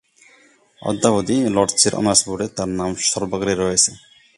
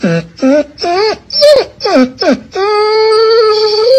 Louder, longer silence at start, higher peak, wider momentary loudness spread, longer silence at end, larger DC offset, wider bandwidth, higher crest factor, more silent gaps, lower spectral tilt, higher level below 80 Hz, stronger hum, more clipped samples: second, -18 LUFS vs -10 LUFS; first, 0.8 s vs 0 s; about the same, 0 dBFS vs 0 dBFS; about the same, 8 LU vs 6 LU; first, 0.4 s vs 0 s; neither; about the same, 11.5 kHz vs 12 kHz; first, 20 dB vs 10 dB; neither; second, -3 dB/octave vs -5 dB/octave; about the same, -48 dBFS vs -48 dBFS; neither; second, under 0.1% vs 0.6%